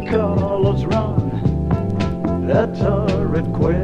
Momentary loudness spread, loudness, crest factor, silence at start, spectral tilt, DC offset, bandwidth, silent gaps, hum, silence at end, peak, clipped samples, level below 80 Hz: 3 LU; -19 LUFS; 14 dB; 0 s; -9 dB/octave; 0.8%; 8 kHz; none; none; 0 s; -4 dBFS; under 0.1%; -30 dBFS